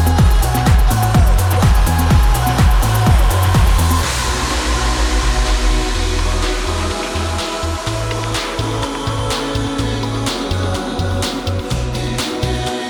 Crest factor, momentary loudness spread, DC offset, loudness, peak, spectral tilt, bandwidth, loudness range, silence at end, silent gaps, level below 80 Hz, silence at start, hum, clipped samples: 12 dB; 7 LU; under 0.1%; -16 LUFS; -2 dBFS; -5 dB/octave; 19.5 kHz; 6 LU; 0 s; none; -18 dBFS; 0 s; none; under 0.1%